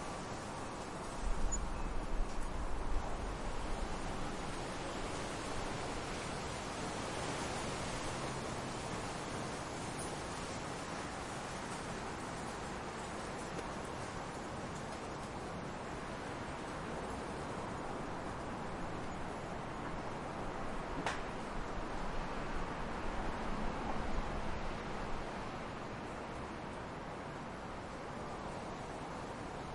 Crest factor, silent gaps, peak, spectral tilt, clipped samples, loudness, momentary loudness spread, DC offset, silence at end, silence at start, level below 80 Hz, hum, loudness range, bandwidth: 18 dB; none; -22 dBFS; -4.5 dB/octave; under 0.1%; -43 LUFS; 4 LU; under 0.1%; 0 s; 0 s; -46 dBFS; none; 3 LU; 11.5 kHz